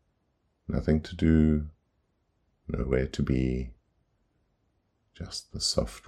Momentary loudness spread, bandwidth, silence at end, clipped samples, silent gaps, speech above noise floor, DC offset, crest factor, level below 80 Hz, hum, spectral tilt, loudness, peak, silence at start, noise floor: 20 LU; 13 kHz; 0.1 s; under 0.1%; none; 47 dB; under 0.1%; 20 dB; -40 dBFS; none; -6 dB/octave; -28 LUFS; -10 dBFS; 0.7 s; -74 dBFS